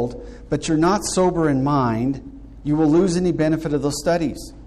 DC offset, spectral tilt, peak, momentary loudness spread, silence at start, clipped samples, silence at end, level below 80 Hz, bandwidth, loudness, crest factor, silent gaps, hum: under 0.1%; -6 dB/octave; -8 dBFS; 11 LU; 0 s; under 0.1%; 0 s; -40 dBFS; 13.5 kHz; -20 LUFS; 12 dB; none; none